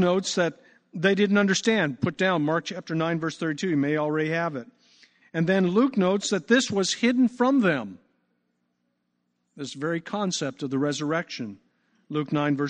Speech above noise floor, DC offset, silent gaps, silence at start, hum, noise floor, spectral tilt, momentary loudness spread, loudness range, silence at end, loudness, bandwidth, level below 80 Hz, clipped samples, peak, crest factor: 51 dB; under 0.1%; none; 0 s; 60 Hz at -50 dBFS; -75 dBFS; -5 dB/octave; 11 LU; 7 LU; 0 s; -25 LUFS; 9.8 kHz; -70 dBFS; under 0.1%; -8 dBFS; 18 dB